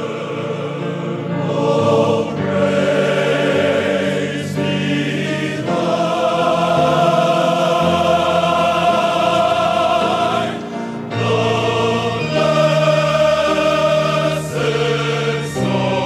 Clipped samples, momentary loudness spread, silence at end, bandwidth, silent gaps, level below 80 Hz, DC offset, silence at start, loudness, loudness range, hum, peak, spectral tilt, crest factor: under 0.1%; 7 LU; 0 s; 14 kHz; none; -50 dBFS; under 0.1%; 0 s; -16 LUFS; 3 LU; none; -2 dBFS; -5.5 dB/octave; 14 dB